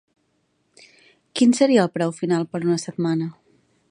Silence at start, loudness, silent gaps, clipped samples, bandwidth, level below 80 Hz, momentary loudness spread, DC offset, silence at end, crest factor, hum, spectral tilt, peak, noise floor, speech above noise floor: 1.35 s; -21 LUFS; none; under 0.1%; 10.5 kHz; -72 dBFS; 9 LU; under 0.1%; 0.6 s; 18 dB; none; -5.5 dB/octave; -4 dBFS; -68 dBFS; 49 dB